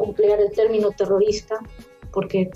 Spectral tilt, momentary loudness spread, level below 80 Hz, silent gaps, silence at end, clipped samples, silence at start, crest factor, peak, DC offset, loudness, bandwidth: -6 dB/octave; 11 LU; -46 dBFS; none; 0 s; under 0.1%; 0 s; 12 dB; -8 dBFS; under 0.1%; -21 LUFS; 7.8 kHz